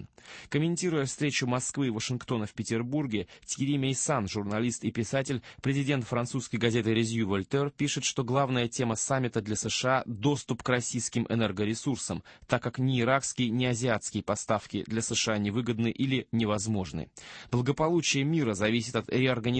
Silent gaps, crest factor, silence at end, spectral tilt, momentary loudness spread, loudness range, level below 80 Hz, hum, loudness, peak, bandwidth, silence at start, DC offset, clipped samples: none; 20 dB; 0 s; -4.5 dB/octave; 6 LU; 2 LU; -58 dBFS; none; -29 LUFS; -10 dBFS; 8.8 kHz; 0 s; under 0.1%; under 0.1%